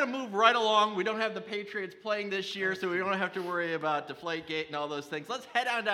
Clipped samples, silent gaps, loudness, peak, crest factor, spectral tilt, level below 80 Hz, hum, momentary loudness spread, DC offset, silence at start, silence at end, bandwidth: under 0.1%; none; -30 LUFS; -6 dBFS; 24 dB; -4 dB/octave; -78 dBFS; none; 12 LU; under 0.1%; 0 s; 0 s; 15 kHz